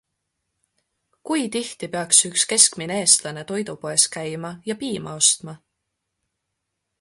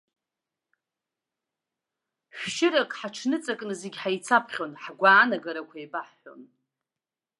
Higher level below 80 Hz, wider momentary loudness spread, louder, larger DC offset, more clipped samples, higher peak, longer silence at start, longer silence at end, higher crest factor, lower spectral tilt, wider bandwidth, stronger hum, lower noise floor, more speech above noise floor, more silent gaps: first, -66 dBFS vs -84 dBFS; second, 14 LU vs 18 LU; first, -19 LUFS vs -25 LUFS; neither; neither; first, 0 dBFS vs -6 dBFS; second, 1.25 s vs 2.35 s; first, 1.45 s vs 0.95 s; about the same, 24 dB vs 22 dB; second, -1.5 dB/octave vs -3 dB/octave; first, 16 kHz vs 11.5 kHz; neither; second, -79 dBFS vs under -90 dBFS; second, 57 dB vs over 64 dB; neither